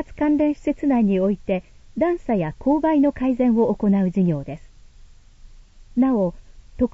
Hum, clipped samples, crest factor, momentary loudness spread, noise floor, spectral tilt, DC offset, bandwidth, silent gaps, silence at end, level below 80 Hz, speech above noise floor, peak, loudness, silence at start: none; under 0.1%; 14 dB; 9 LU; -46 dBFS; -9.5 dB/octave; under 0.1%; 7.8 kHz; none; 0.05 s; -44 dBFS; 27 dB; -8 dBFS; -21 LUFS; 0 s